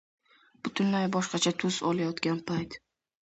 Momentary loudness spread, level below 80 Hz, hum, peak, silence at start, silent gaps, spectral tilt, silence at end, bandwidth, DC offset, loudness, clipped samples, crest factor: 11 LU; -66 dBFS; none; -12 dBFS; 0.65 s; none; -4.5 dB/octave; 0.45 s; 8.2 kHz; under 0.1%; -30 LUFS; under 0.1%; 20 dB